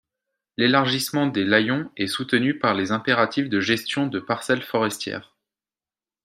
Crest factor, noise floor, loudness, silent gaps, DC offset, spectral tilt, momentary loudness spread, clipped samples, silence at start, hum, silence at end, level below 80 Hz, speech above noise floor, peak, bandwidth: 22 dB; under -90 dBFS; -22 LUFS; none; under 0.1%; -4.5 dB/octave; 7 LU; under 0.1%; 0.6 s; none; 1.05 s; -68 dBFS; over 68 dB; -2 dBFS; 15.5 kHz